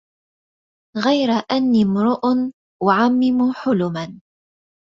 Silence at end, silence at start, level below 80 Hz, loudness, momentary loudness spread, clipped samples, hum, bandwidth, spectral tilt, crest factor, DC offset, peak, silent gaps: 0.7 s; 0.95 s; -60 dBFS; -18 LUFS; 10 LU; under 0.1%; none; 7.2 kHz; -7 dB/octave; 16 dB; under 0.1%; -2 dBFS; 2.54-2.80 s